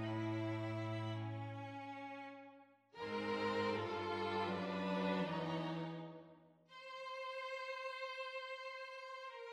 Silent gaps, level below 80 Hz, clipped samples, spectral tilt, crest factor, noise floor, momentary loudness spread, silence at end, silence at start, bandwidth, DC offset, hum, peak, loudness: none; -80 dBFS; under 0.1%; -6.5 dB/octave; 16 dB; -64 dBFS; 14 LU; 0 s; 0 s; 10.5 kHz; under 0.1%; none; -28 dBFS; -43 LUFS